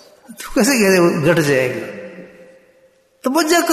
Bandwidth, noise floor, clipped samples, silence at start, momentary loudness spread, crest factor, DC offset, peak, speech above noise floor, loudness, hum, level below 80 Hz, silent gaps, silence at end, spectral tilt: 14 kHz; -54 dBFS; under 0.1%; 0.3 s; 20 LU; 14 dB; under 0.1%; -2 dBFS; 39 dB; -15 LUFS; none; -48 dBFS; none; 0 s; -4.5 dB/octave